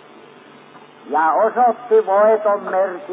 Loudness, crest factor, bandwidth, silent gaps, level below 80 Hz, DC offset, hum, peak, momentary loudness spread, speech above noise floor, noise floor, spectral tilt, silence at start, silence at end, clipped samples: -16 LUFS; 12 dB; 3.9 kHz; none; -88 dBFS; under 0.1%; none; -6 dBFS; 6 LU; 28 dB; -43 dBFS; -8.5 dB/octave; 1.05 s; 0 s; under 0.1%